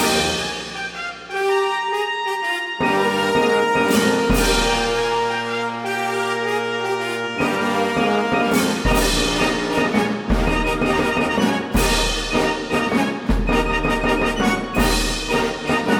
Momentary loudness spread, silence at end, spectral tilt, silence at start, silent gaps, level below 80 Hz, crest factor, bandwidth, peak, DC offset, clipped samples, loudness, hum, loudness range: 5 LU; 0 s; -4 dB/octave; 0 s; none; -30 dBFS; 14 dB; 19.5 kHz; -4 dBFS; under 0.1%; under 0.1%; -19 LUFS; none; 3 LU